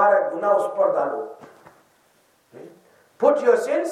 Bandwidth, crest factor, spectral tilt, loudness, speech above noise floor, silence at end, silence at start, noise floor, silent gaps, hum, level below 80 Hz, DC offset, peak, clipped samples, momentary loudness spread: 12.5 kHz; 18 dB; -5 dB/octave; -21 LUFS; 40 dB; 0 s; 0 s; -61 dBFS; none; none; -80 dBFS; under 0.1%; -4 dBFS; under 0.1%; 9 LU